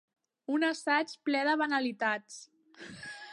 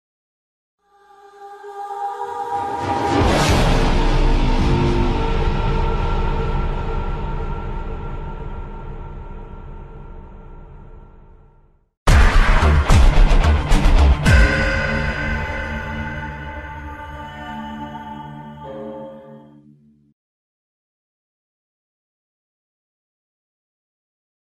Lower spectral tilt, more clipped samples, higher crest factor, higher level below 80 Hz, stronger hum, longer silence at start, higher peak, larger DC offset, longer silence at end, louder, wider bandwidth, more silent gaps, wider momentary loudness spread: second, -3 dB/octave vs -6 dB/octave; neither; about the same, 18 dB vs 18 dB; second, -80 dBFS vs -20 dBFS; neither; second, 0.5 s vs 1.4 s; second, -14 dBFS vs -2 dBFS; neither; second, 0 s vs 5.15 s; second, -31 LUFS vs -19 LUFS; about the same, 11.5 kHz vs 12 kHz; second, none vs 11.97-12.06 s; about the same, 20 LU vs 20 LU